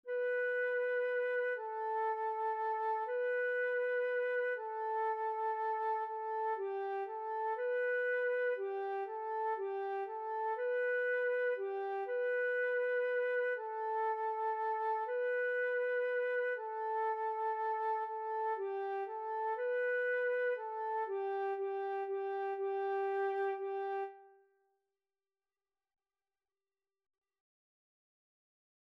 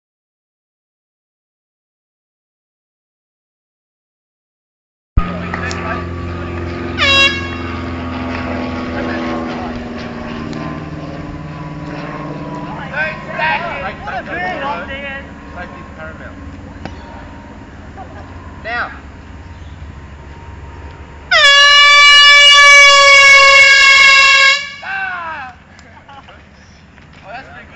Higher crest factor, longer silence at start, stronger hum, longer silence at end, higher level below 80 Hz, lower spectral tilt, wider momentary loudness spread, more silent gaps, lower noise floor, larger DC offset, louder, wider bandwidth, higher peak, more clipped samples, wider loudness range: about the same, 10 dB vs 14 dB; second, 0.05 s vs 5.15 s; neither; first, 4.6 s vs 0 s; second, under -90 dBFS vs -34 dBFS; about the same, -2.5 dB/octave vs -2 dB/octave; second, 5 LU vs 26 LU; neither; first, under -90 dBFS vs -41 dBFS; neither; second, -36 LUFS vs -7 LUFS; second, 5.2 kHz vs 11 kHz; second, -26 dBFS vs 0 dBFS; neither; second, 3 LU vs 24 LU